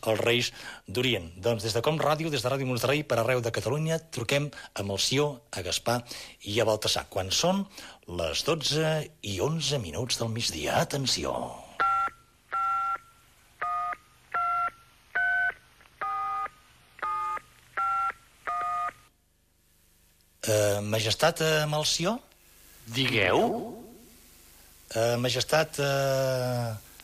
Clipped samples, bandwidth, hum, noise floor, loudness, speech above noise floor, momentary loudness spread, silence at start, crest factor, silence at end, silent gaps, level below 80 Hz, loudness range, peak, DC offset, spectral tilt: under 0.1%; 15.5 kHz; 50 Hz at -60 dBFS; -67 dBFS; -28 LUFS; 39 dB; 11 LU; 0.05 s; 20 dB; 0 s; none; -58 dBFS; 4 LU; -8 dBFS; under 0.1%; -3.5 dB/octave